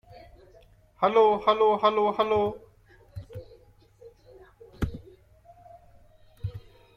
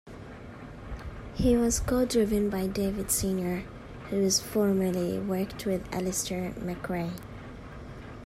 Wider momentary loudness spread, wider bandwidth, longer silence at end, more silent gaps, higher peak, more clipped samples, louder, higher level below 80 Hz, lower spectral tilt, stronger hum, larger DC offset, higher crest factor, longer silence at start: first, 25 LU vs 18 LU; second, 7 kHz vs 16 kHz; first, 0.35 s vs 0 s; neither; first, -8 dBFS vs -14 dBFS; neither; first, -24 LUFS vs -28 LUFS; second, -50 dBFS vs -44 dBFS; first, -7 dB/octave vs -4.5 dB/octave; neither; neither; about the same, 20 dB vs 16 dB; first, 1 s vs 0.05 s